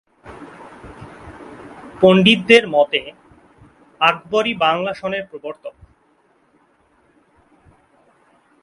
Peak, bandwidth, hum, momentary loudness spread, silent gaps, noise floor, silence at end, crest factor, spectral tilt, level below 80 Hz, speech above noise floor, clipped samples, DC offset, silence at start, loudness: 0 dBFS; 11.5 kHz; none; 27 LU; none; -59 dBFS; 2.95 s; 20 dB; -5.5 dB/octave; -54 dBFS; 43 dB; under 0.1%; under 0.1%; 0.25 s; -15 LUFS